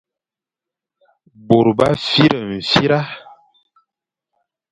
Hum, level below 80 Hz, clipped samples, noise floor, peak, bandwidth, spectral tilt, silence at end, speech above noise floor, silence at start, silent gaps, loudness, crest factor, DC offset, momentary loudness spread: none; -50 dBFS; under 0.1%; -88 dBFS; 0 dBFS; 11 kHz; -6 dB/octave; 1.5 s; 73 dB; 1.5 s; none; -15 LUFS; 20 dB; under 0.1%; 8 LU